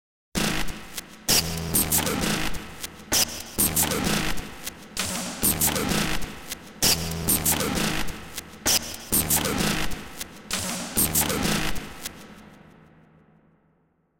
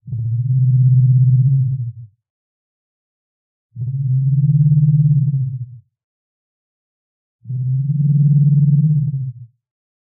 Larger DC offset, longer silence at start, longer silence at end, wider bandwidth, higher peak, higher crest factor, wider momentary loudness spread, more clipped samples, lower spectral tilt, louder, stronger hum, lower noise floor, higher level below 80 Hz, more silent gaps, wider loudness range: neither; first, 0.3 s vs 0.05 s; second, 0 s vs 0.65 s; first, 17 kHz vs 0.5 kHz; about the same, -6 dBFS vs -6 dBFS; first, 20 dB vs 12 dB; about the same, 15 LU vs 13 LU; neither; second, -2.5 dB/octave vs -24.5 dB/octave; second, -24 LUFS vs -15 LUFS; neither; second, -67 dBFS vs under -90 dBFS; first, -40 dBFS vs -52 dBFS; second, none vs 2.30-3.69 s, 6.04-7.39 s; about the same, 4 LU vs 4 LU